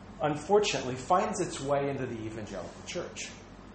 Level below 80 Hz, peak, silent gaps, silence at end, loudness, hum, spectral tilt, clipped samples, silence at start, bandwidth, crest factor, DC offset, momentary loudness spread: -56 dBFS; -12 dBFS; none; 0 s; -31 LUFS; none; -4.5 dB/octave; under 0.1%; 0 s; 8.8 kHz; 20 dB; under 0.1%; 14 LU